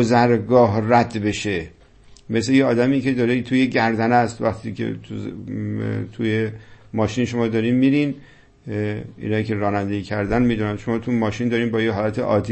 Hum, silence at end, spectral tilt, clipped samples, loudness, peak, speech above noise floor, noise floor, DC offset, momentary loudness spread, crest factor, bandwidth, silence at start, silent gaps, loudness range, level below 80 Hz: none; 0 s; -7 dB/octave; under 0.1%; -21 LUFS; -2 dBFS; 28 dB; -48 dBFS; under 0.1%; 12 LU; 18 dB; 8.6 kHz; 0 s; none; 4 LU; -48 dBFS